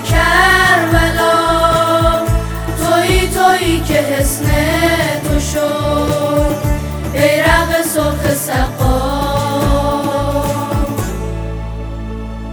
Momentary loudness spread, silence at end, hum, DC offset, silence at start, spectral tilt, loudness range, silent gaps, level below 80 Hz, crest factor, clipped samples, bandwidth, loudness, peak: 11 LU; 0 s; none; under 0.1%; 0 s; -4.5 dB/octave; 4 LU; none; -22 dBFS; 14 dB; under 0.1%; over 20 kHz; -14 LUFS; 0 dBFS